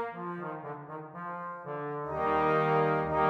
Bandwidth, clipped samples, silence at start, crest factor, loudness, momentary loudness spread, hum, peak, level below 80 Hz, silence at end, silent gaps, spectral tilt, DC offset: 7 kHz; under 0.1%; 0 s; 18 dB; -32 LUFS; 15 LU; none; -14 dBFS; -60 dBFS; 0 s; none; -8.5 dB/octave; under 0.1%